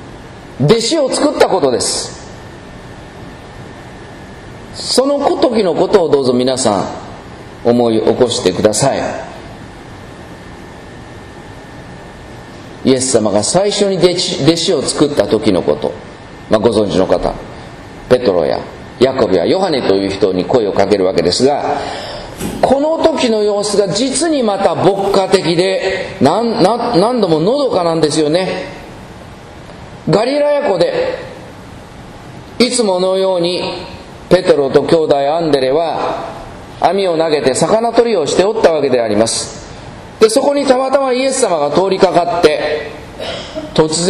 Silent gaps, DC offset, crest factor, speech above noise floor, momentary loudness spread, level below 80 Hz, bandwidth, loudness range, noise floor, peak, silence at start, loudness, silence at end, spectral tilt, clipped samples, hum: none; under 0.1%; 14 dB; 20 dB; 21 LU; -42 dBFS; 13 kHz; 5 LU; -33 dBFS; 0 dBFS; 0 s; -13 LUFS; 0 s; -4.5 dB/octave; 0.2%; none